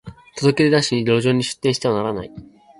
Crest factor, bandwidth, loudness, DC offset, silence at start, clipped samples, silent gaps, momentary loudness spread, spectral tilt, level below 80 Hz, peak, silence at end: 16 dB; 11.5 kHz; -18 LUFS; under 0.1%; 0.05 s; under 0.1%; none; 13 LU; -5.5 dB/octave; -52 dBFS; -4 dBFS; 0.35 s